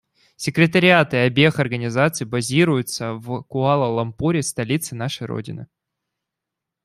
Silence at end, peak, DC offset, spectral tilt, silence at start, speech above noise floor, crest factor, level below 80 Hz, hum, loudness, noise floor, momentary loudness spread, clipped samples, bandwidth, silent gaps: 1.2 s; -2 dBFS; under 0.1%; -5 dB/octave; 0.4 s; 64 dB; 18 dB; -56 dBFS; none; -20 LUFS; -84 dBFS; 13 LU; under 0.1%; 13.5 kHz; none